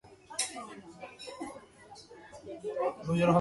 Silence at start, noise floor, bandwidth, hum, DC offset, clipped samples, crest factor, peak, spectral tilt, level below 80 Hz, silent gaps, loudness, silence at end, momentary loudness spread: 0.05 s; -54 dBFS; 11.5 kHz; none; under 0.1%; under 0.1%; 22 dB; -12 dBFS; -5 dB/octave; -64 dBFS; none; -35 LUFS; 0 s; 20 LU